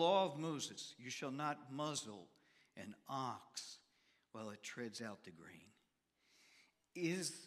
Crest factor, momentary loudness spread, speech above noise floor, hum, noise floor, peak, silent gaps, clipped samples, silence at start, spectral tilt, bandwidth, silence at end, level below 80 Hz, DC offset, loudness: 22 dB; 18 LU; 38 dB; none; -82 dBFS; -22 dBFS; none; under 0.1%; 0 s; -4 dB/octave; 15.5 kHz; 0 s; under -90 dBFS; under 0.1%; -45 LUFS